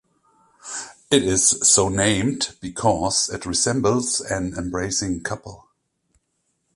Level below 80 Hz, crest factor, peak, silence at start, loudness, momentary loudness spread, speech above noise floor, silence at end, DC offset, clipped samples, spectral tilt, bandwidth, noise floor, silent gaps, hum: -46 dBFS; 20 dB; -2 dBFS; 0.65 s; -20 LUFS; 17 LU; 51 dB; 1.2 s; under 0.1%; under 0.1%; -3 dB/octave; 11.5 kHz; -72 dBFS; none; none